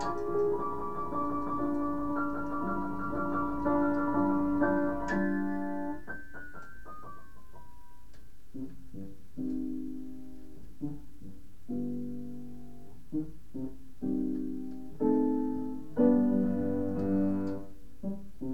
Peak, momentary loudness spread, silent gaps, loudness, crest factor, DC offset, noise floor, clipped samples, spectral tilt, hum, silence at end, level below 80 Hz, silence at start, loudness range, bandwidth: -14 dBFS; 19 LU; none; -32 LUFS; 20 dB; 1%; -54 dBFS; under 0.1%; -9 dB/octave; none; 0 s; -54 dBFS; 0 s; 13 LU; 8 kHz